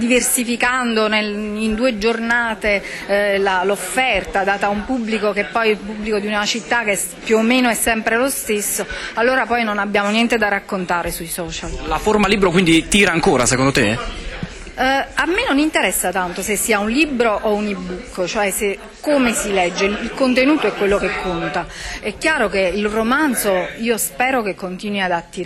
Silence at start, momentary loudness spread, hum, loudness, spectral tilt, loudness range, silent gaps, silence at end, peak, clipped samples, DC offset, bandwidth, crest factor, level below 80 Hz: 0 s; 9 LU; none; -17 LUFS; -3.5 dB/octave; 3 LU; none; 0 s; -4 dBFS; under 0.1%; under 0.1%; 15 kHz; 14 dB; -38 dBFS